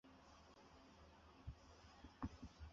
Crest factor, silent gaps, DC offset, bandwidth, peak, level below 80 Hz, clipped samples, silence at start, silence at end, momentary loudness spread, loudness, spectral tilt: 24 dB; none; under 0.1%; 7.4 kHz; -34 dBFS; -64 dBFS; under 0.1%; 0.05 s; 0 s; 12 LU; -60 LUFS; -6 dB/octave